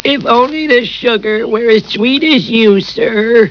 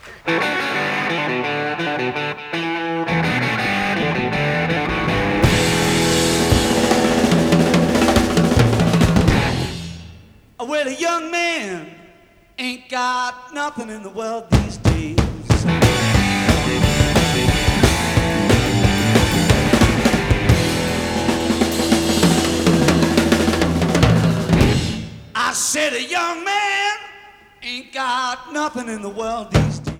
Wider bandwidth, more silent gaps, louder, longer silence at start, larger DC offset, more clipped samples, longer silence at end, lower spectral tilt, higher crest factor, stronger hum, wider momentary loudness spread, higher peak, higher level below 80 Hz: second, 5.4 kHz vs 17.5 kHz; neither; first, -10 LUFS vs -18 LUFS; about the same, 0.05 s vs 0.05 s; neither; first, 0.5% vs under 0.1%; about the same, 0 s vs 0 s; about the same, -6 dB/octave vs -5 dB/octave; second, 10 dB vs 18 dB; neither; second, 4 LU vs 11 LU; about the same, 0 dBFS vs 0 dBFS; second, -48 dBFS vs -30 dBFS